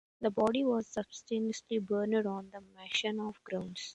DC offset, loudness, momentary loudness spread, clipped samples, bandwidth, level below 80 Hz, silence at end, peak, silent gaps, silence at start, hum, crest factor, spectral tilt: under 0.1%; -34 LUFS; 10 LU; under 0.1%; 11 kHz; -72 dBFS; 0 s; -18 dBFS; none; 0.2 s; none; 18 dB; -4.5 dB/octave